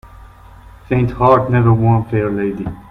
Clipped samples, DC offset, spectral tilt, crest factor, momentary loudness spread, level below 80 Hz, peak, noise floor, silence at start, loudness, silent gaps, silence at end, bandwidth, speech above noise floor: under 0.1%; under 0.1%; -10.5 dB/octave; 16 dB; 8 LU; -36 dBFS; 0 dBFS; -39 dBFS; 0.05 s; -15 LUFS; none; 0.1 s; 4.2 kHz; 26 dB